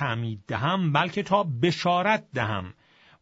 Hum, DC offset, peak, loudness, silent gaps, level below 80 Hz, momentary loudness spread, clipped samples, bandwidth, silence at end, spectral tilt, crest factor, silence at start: none; under 0.1%; -8 dBFS; -25 LUFS; none; -62 dBFS; 8 LU; under 0.1%; 8 kHz; 0.5 s; -6 dB/octave; 18 dB; 0 s